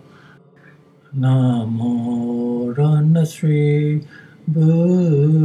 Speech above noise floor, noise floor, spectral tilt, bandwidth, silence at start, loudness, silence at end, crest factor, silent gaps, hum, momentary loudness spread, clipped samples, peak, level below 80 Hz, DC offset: 32 dB; -48 dBFS; -9 dB/octave; 11 kHz; 1.1 s; -17 LUFS; 0 s; 12 dB; none; none; 7 LU; under 0.1%; -4 dBFS; -66 dBFS; under 0.1%